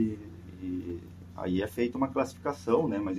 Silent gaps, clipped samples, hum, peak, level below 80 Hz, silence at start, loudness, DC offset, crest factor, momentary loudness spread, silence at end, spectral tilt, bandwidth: none; under 0.1%; none; -12 dBFS; -58 dBFS; 0 s; -32 LUFS; under 0.1%; 20 dB; 15 LU; 0 s; -7 dB/octave; 14.5 kHz